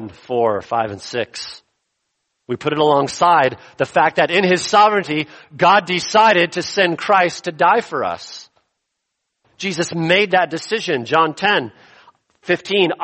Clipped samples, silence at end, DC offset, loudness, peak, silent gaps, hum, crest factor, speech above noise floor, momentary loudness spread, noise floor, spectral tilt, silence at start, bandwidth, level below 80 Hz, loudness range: under 0.1%; 0 s; under 0.1%; -16 LUFS; -2 dBFS; none; none; 16 dB; 59 dB; 12 LU; -76 dBFS; -4 dB/octave; 0 s; 8.8 kHz; -62 dBFS; 5 LU